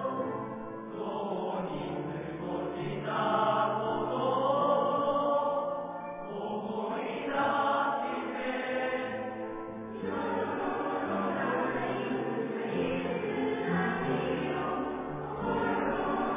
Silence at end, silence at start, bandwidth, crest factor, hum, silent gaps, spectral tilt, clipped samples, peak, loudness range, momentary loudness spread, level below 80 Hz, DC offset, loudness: 0 s; 0 s; 3.8 kHz; 16 dB; none; none; -4.5 dB/octave; under 0.1%; -16 dBFS; 4 LU; 9 LU; -60 dBFS; under 0.1%; -32 LUFS